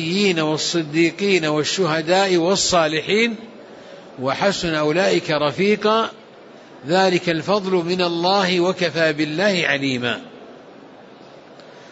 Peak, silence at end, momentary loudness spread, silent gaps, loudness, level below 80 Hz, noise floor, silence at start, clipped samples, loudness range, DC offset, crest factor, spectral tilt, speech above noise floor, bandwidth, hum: -4 dBFS; 0 s; 7 LU; none; -19 LUFS; -56 dBFS; -43 dBFS; 0 s; under 0.1%; 2 LU; under 0.1%; 16 dB; -4 dB/octave; 24 dB; 8 kHz; none